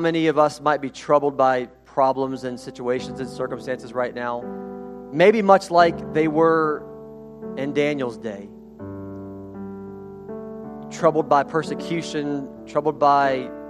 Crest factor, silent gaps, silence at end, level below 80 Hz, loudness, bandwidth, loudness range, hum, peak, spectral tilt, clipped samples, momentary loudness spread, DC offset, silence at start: 22 dB; none; 0 s; -58 dBFS; -21 LUFS; 12.5 kHz; 10 LU; none; 0 dBFS; -6 dB/octave; under 0.1%; 19 LU; under 0.1%; 0 s